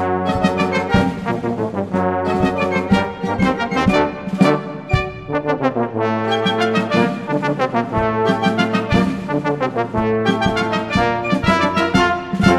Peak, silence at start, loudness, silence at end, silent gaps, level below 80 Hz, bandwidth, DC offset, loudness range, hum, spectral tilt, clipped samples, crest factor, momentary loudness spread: 0 dBFS; 0 s; -18 LUFS; 0 s; none; -38 dBFS; 12 kHz; 0.2%; 1 LU; none; -6.5 dB/octave; under 0.1%; 18 dB; 5 LU